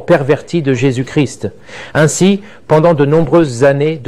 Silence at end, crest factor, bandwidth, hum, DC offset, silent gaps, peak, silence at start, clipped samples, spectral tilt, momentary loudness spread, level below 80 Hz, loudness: 0.05 s; 10 dB; 13 kHz; none; 1%; none; 0 dBFS; 0 s; under 0.1%; -6 dB/octave; 9 LU; -42 dBFS; -12 LUFS